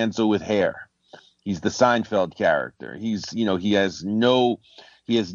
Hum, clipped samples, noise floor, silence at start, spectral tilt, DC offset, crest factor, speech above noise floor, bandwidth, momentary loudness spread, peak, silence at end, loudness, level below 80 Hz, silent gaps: none; under 0.1%; -51 dBFS; 0 s; -5 dB/octave; under 0.1%; 18 dB; 29 dB; 7.6 kHz; 13 LU; -6 dBFS; 0 s; -23 LUFS; -60 dBFS; none